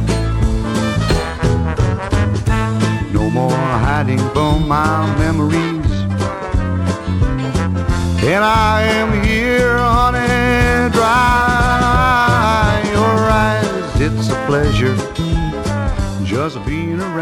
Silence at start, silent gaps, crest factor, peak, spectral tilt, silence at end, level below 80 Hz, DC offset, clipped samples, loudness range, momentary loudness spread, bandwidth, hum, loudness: 0 s; none; 12 dB; -2 dBFS; -6 dB/octave; 0 s; -24 dBFS; under 0.1%; under 0.1%; 4 LU; 7 LU; 16.5 kHz; none; -15 LUFS